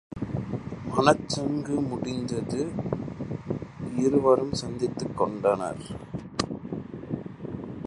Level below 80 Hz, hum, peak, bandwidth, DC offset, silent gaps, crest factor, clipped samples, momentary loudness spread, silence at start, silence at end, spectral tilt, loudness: -52 dBFS; none; -2 dBFS; 11 kHz; under 0.1%; none; 26 dB; under 0.1%; 14 LU; 0.1 s; 0 s; -6 dB/octave; -28 LUFS